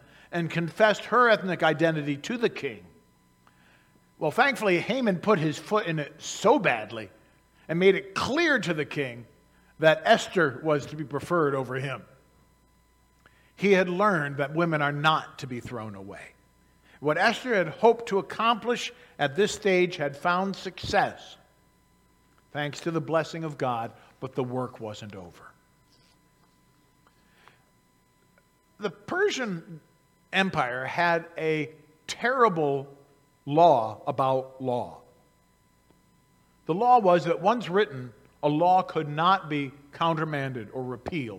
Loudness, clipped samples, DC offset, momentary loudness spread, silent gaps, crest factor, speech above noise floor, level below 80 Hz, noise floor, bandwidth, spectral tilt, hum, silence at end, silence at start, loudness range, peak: -26 LUFS; under 0.1%; under 0.1%; 16 LU; none; 22 dB; 39 dB; -66 dBFS; -64 dBFS; 16 kHz; -5.5 dB/octave; none; 0 s; 0.3 s; 8 LU; -4 dBFS